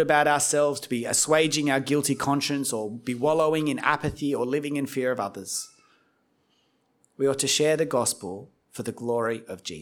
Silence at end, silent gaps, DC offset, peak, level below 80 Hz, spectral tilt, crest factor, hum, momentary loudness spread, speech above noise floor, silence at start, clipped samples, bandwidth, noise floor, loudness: 0 s; none; under 0.1%; -6 dBFS; -60 dBFS; -3.5 dB/octave; 20 dB; none; 12 LU; 43 dB; 0 s; under 0.1%; 18.5 kHz; -68 dBFS; -25 LUFS